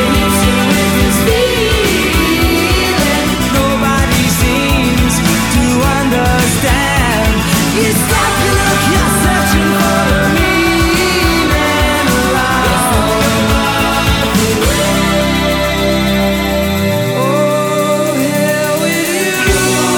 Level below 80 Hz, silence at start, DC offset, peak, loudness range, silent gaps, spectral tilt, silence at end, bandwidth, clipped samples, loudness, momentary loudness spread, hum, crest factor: -22 dBFS; 0 s; under 0.1%; 0 dBFS; 2 LU; none; -4 dB/octave; 0 s; 19.5 kHz; under 0.1%; -11 LUFS; 2 LU; none; 12 dB